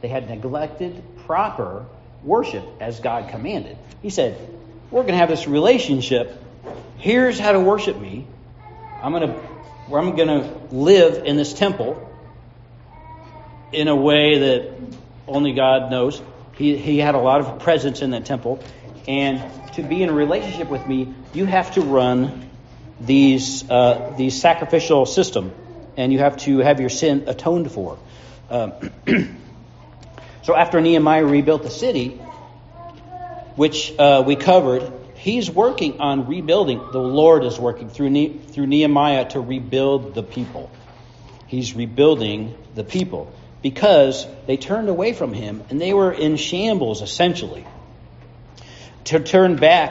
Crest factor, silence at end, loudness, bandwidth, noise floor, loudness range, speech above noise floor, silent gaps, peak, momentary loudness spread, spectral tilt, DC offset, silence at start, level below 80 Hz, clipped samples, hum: 18 dB; 0 s; -18 LUFS; 8 kHz; -43 dBFS; 5 LU; 26 dB; none; 0 dBFS; 18 LU; -4.5 dB/octave; under 0.1%; 0.05 s; -48 dBFS; under 0.1%; none